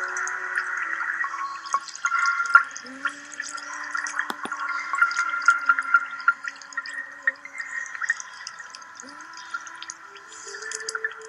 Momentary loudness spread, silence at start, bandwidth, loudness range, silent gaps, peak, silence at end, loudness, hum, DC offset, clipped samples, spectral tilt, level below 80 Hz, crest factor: 17 LU; 0 s; 13 kHz; 9 LU; none; -2 dBFS; 0 s; -25 LUFS; none; under 0.1%; under 0.1%; 1 dB/octave; -84 dBFS; 26 dB